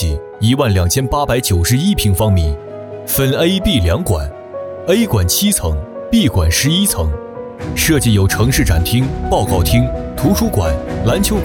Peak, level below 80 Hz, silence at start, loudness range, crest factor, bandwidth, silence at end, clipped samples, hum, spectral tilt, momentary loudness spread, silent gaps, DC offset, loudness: 0 dBFS; -24 dBFS; 0 s; 1 LU; 14 dB; 18 kHz; 0 s; under 0.1%; none; -5 dB/octave; 10 LU; none; under 0.1%; -14 LUFS